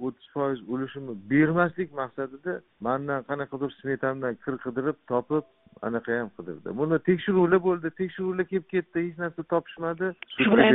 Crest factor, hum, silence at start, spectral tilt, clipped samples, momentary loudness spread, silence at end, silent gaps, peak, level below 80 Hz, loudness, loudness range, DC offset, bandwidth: 22 dB; none; 0 s; -5 dB/octave; under 0.1%; 12 LU; 0 s; none; -4 dBFS; -62 dBFS; -28 LUFS; 4 LU; under 0.1%; 4 kHz